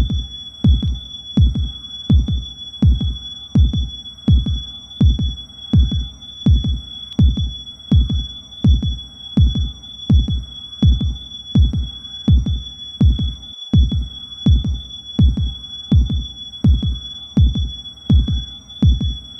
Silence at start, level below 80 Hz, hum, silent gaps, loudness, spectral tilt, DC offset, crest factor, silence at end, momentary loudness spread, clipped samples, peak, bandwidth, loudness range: 0 s; -20 dBFS; none; none; -19 LUFS; -7.5 dB/octave; under 0.1%; 12 dB; 0 s; 12 LU; under 0.1%; -4 dBFS; 6 kHz; 1 LU